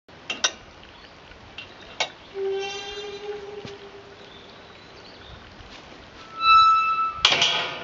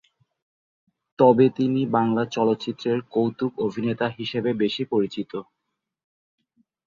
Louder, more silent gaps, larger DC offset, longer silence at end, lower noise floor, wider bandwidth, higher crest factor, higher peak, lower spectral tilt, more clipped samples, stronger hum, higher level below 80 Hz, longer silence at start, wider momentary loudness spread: about the same, -21 LUFS vs -23 LUFS; neither; neither; second, 0 s vs 1.45 s; second, -46 dBFS vs -81 dBFS; about the same, 7.6 kHz vs 7.4 kHz; first, 26 dB vs 20 dB; first, 0 dBFS vs -4 dBFS; second, 1.5 dB/octave vs -7.5 dB/octave; neither; neither; first, -56 dBFS vs -66 dBFS; second, 0.15 s vs 1.2 s; first, 27 LU vs 8 LU